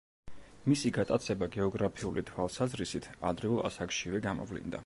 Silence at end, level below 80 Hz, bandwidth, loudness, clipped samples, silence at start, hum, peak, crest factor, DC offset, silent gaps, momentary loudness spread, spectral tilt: 0 s; -56 dBFS; 11.5 kHz; -34 LUFS; under 0.1%; 0.25 s; none; -16 dBFS; 18 dB; under 0.1%; none; 7 LU; -5.5 dB/octave